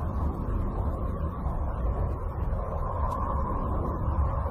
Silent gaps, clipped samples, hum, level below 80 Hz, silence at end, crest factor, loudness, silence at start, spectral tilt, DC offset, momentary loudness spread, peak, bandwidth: none; under 0.1%; none; -30 dBFS; 0 s; 12 dB; -31 LUFS; 0 s; -10 dB/octave; under 0.1%; 3 LU; -16 dBFS; 4 kHz